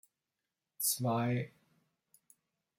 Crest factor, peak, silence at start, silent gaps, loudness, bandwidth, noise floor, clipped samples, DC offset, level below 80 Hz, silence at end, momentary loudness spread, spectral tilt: 18 dB; -20 dBFS; 0.8 s; none; -34 LUFS; 16.5 kHz; -89 dBFS; under 0.1%; under 0.1%; -78 dBFS; 1.3 s; 7 LU; -4.5 dB/octave